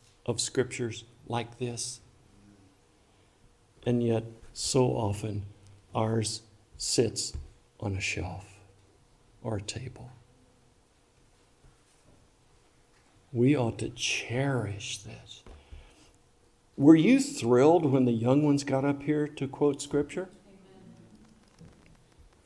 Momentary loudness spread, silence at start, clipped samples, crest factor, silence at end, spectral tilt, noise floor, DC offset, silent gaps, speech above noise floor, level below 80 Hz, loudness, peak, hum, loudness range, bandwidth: 19 LU; 0.3 s; under 0.1%; 24 dB; 0.8 s; -5.5 dB/octave; -64 dBFS; under 0.1%; none; 37 dB; -58 dBFS; -28 LUFS; -6 dBFS; none; 15 LU; 12 kHz